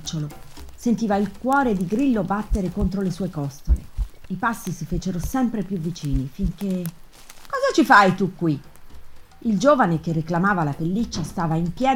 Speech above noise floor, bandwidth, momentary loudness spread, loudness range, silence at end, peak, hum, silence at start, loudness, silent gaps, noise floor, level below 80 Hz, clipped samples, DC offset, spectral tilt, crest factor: 20 dB; 17 kHz; 12 LU; 6 LU; 0 s; 0 dBFS; none; 0 s; -22 LUFS; none; -41 dBFS; -34 dBFS; under 0.1%; under 0.1%; -6 dB/octave; 22 dB